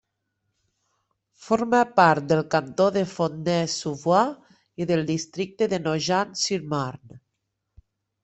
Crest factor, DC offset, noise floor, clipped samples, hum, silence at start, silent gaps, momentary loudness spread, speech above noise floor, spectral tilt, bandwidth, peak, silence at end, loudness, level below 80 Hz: 22 dB; under 0.1%; -79 dBFS; under 0.1%; none; 1.4 s; none; 9 LU; 56 dB; -5 dB/octave; 8.4 kHz; -2 dBFS; 1.05 s; -23 LUFS; -64 dBFS